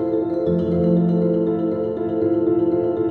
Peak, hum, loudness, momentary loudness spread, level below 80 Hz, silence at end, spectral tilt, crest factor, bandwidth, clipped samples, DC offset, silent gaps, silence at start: -8 dBFS; none; -20 LUFS; 4 LU; -50 dBFS; 0 s; -12 dB/octave; 12 dB; 4.3 kHz; under 0.1%; under 0.1%; none; 0 s